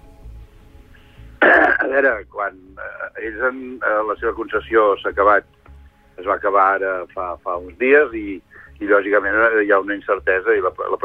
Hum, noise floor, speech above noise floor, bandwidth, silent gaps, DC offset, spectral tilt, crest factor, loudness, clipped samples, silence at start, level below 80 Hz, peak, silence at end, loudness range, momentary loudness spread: none; -45 dBFS; 27 dB; 5.2 kHz; none; under 0.1%; -7 dB/octave; 16 dB; -18 LUFS; under 0.1%; 0.25 s; -46 dBFS; -2 dBFS; 0.05 s; 2 LU; 14 LU